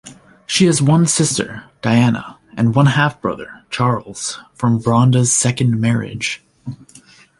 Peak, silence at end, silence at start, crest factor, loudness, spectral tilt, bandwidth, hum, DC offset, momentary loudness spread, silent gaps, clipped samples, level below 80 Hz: -2 dBFS; 0.65 s; 0.05 s; 16 dB; -16 LUFS; -5 dB/octave; 11.5 kHz; none; under 0.1%; 14 LU; none; under 0.1%; -50 dBFS